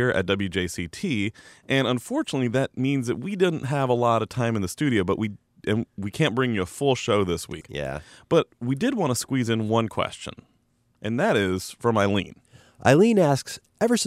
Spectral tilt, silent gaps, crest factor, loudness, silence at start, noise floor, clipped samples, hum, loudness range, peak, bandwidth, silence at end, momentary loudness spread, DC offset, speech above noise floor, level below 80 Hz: -5.5 dB/octave; none; 18 dB; -24 LUFS; 0 s; -66 dBFS; under 0.1%; none; 3 LU; -6 dBFS; 15.5 kHz; 0 s; 10 LU; under 0.1%; 43 dB; -54 dBFS